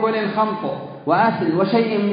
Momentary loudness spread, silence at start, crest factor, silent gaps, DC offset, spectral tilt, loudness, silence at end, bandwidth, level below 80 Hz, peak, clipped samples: 9 LU; 0 s; 16 dB; none; under 0.1%; -11.5 dB/octave; -19 LUFS; 0 s; 5.2 kHz; -64 dBFS; -4 dBFS; under 0.1%